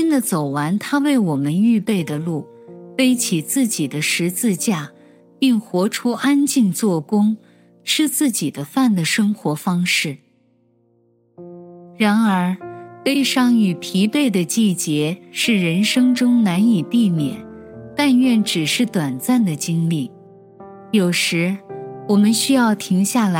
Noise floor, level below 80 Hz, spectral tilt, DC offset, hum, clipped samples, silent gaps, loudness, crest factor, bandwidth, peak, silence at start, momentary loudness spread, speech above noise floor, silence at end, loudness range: -59 dBFS; -66 dBFS; -4.5 dB/octave; under 0.1%; none; under 0.1%; none; -18 LUFS; 16 dB; 16.5 kHz; -2 dBFS; 0 s; 10 LU; 42 dB; 0 s; 4 LU